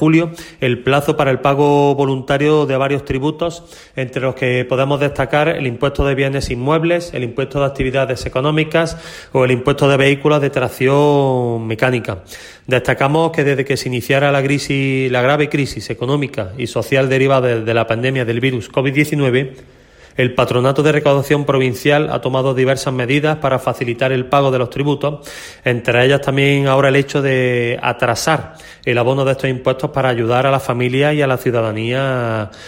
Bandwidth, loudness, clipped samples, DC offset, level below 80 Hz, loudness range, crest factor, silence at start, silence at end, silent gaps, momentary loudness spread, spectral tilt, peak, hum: 16.5 kHz; -16 LUFS; under 0.1%; under 0.1%; -40 dBFS; 2 LU; 14 dB; 0 s; 0 s; none; 8 LU; -6 dB/octave; 0 dBFS; none